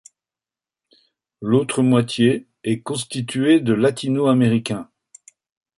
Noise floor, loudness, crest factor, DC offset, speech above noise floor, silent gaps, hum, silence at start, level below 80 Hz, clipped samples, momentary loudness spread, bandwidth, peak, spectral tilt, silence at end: under -90 dBFS; -19 LUFS; 18 dB; under 0.1%; over 72 dB; none; none; 1.4 s; -60 dBFS; under 0.1%; 9 LU; 11.5 kHz; -4 dBFS; -6 dB/octave; 0.95 s